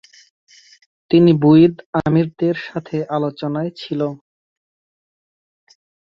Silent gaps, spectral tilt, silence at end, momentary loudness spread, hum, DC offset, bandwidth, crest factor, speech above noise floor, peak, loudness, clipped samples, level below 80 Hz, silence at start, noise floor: 1.86-1.93 s; -9 dB/octave; 1.95 s; 13 LU; none; under 0.1%; 6.6 kHz; 18 dB; over 74 dB; -2 dBFS; -17 LUFS; under 0.1%; -56 dBFS; 1.1 s; under -90 dBFS